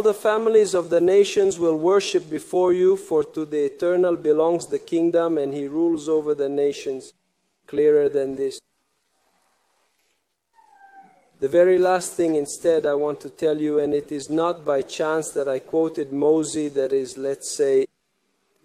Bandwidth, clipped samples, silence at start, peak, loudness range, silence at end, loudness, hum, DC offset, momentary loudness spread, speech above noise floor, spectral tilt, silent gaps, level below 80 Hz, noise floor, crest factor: 14.5 kHz; under 0.1%; 0 s; -6 dBFS; 6 LU; 0.8 s; -21 LUFS; none; under 0.1%; 9 LU; 51 dB; -5 dB/octave; none; -68 dBFS; -72 dBFS; 16 dB